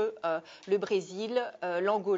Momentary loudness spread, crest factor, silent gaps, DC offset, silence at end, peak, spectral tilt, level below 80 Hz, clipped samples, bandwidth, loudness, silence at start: 4 LU; 14 dB; none; under 0.1%; 0 s; -16 dBFS; -5 dB/octave; -84 dBFS; under 0.1%; 7.8 kHz; -32 LUFS; 0 s